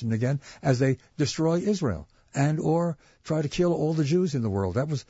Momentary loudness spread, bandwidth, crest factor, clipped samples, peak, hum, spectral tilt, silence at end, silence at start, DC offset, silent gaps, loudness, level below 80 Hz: 6 LU; 8 kHz; 16 dB; under 0.1%; -10 dBFS; none; -7 dB/octave; 0.1 s; 0 s; under 0.1%; none; -26 LUFS; -52 dBFS